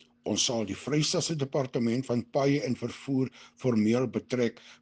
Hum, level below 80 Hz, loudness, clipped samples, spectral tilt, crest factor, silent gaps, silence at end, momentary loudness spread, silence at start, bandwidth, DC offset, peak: none; -68 dBFS; -29 LUFS; under 0.1%; -5 dB/octave; 16 dB; none; 0.1 s; 6 LU; 0.25 s; 10 kHz; under 0.1%; -14 dBFS